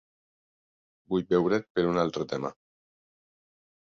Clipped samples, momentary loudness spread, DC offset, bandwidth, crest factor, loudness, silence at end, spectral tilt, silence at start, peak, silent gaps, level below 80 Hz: under 0.1%; 8 LU; under 0.1%; 7.2 kHz; 20 dB; -28 LUFS; 1.45 s; -7 dB/octave; 1.1 s; -12 dBFS; 1.70-1.75 s; -64 dBFS